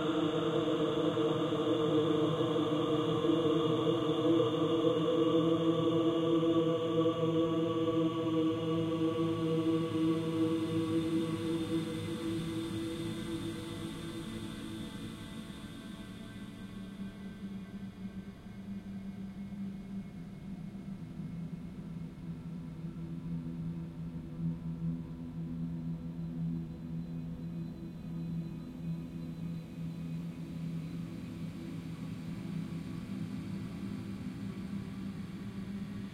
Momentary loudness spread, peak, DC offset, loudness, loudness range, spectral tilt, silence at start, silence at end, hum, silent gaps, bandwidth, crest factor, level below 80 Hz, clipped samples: 14 LU; -16 dBFS; under 0.1%; -35 LUFS; 14 LU; -7.5 dB/octave; 0 s; 0 s; none; none; 13.5 kHz; 18 dB; -58 dBFS; under 0.1%